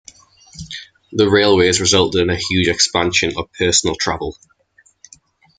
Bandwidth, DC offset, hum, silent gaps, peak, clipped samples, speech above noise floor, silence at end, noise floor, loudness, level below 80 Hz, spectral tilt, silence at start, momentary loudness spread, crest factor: 10 kHz; under 0.1%; none; none; 0 dBFS; under 0.1%; 39 dB; 1.25 s; -56 dBFS; -15 LUFS; -46 dBFS; -3 dB/octave; 0.55 s; 18 LU; 18 dB